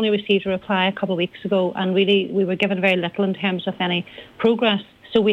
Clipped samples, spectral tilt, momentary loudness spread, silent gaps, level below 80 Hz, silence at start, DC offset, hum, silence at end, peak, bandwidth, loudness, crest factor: under 0.1%; -7.5 dB/octave; 5 LU; none; -60 dBFS; 0 s; under 0.1%; none; 0 s; -6 dBFS; 7.2 kHz; -21 LUFS; 14 dB